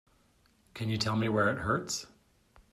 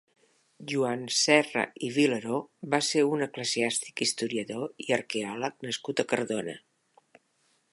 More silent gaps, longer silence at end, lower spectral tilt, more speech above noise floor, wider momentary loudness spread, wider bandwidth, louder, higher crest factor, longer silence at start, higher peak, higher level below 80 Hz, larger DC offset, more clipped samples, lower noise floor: neither; second, 0.65 s vs 1.15 s; first, -4.5 dB/octave vs -3 dB/octave; second, 37 dB vs 42 dB; first, 15 LU vs 11 LU; first, 14 kHz vs 11.5 kHz; second, -31 LUFS vs -28 LUFS; about the same, 20 dB vs 24 dB; first, 0.75 s vs 0.6 s; second, -14 dBFS vs -6 dBFS; first, -62 dBFS vs -78 dBFS; neither; neither; second, -67 dBFS vs -71 dBFS